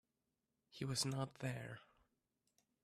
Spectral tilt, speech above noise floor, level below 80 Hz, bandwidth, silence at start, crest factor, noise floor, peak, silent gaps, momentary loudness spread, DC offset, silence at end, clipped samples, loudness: -4 dB/octave; 45 dB; -76 dBFS; 14.5 kHz; 0.75 s; 20 dB; -89 dBFS; -28 dBFS; none; 17 LU; under 0.1%; 1 s; under 0.1%; -44 LUFS